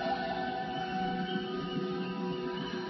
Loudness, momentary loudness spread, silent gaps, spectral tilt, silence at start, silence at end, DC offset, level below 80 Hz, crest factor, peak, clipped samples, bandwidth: -35 LUFS; 2 LU; none; -4 dB/octave; 0 s; 0 s; under 0.1%; -62 dBFS; 14 dB; -22 dBFS; under 0.1%; 6 kHz